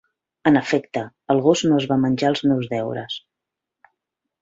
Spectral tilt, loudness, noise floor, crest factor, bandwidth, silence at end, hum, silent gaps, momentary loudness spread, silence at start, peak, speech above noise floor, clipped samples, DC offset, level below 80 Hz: -6 dB/octave; -20 LUFS; -84 dBFS; 18 dB; 8 kHz; 1.25 s; none; none; 12 LU; 0.45 s; -2 dBFS; 65 dB; under 0.1%; under 0.1%; -60 dBFS